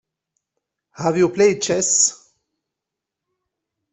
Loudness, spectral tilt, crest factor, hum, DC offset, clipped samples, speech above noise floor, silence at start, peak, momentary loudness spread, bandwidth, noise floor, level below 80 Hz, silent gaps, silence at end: -17 LUFS; -3 dB/octave; 18 dB; none; under 0.1%; under 0.1%; 67 dB; 1 s; -4 dBFS; 6 LU; 8.4 kHz; -84 dBFS; -62 dBFS; none; 1.8 s